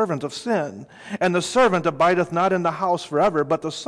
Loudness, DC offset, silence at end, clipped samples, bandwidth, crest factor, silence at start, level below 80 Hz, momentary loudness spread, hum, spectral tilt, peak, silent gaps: -21 LUFS; under 0.1%; 0 s; under 0.1%; 11 kHz; 12 dB; 0 s; -58 dBFS; 8 LU; none; -5 dB/octave; -10 dBFS; none